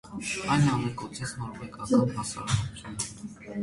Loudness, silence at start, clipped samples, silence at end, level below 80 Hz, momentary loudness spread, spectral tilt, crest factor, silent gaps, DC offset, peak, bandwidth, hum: -29 LUFS; 0.05 s; under 0.1%; 0 s; -50 dBFS; 14 LU; -5 dB/octave; 20 dB; none; under 0.1%; -10 dBFS; 11.5 kHz; none